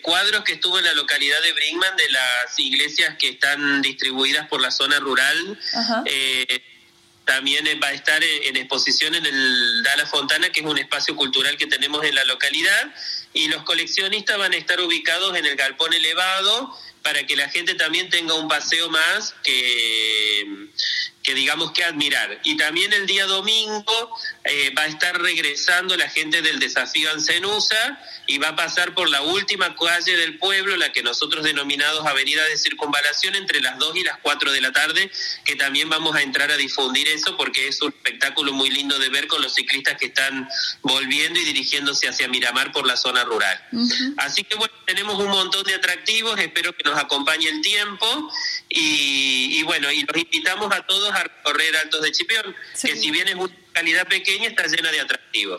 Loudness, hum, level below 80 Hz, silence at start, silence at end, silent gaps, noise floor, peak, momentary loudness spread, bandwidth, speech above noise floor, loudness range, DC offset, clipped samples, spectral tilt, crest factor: -19 LUFS; none; -70 dBFS; 0 s; 0 s; none; -54 dBFS; -4 dBFS; 5 LU; 15.5 kHz; 33 dB; 2 LU; under 0.1%; under 0.1%; -0.5 dB/octave; 16 dB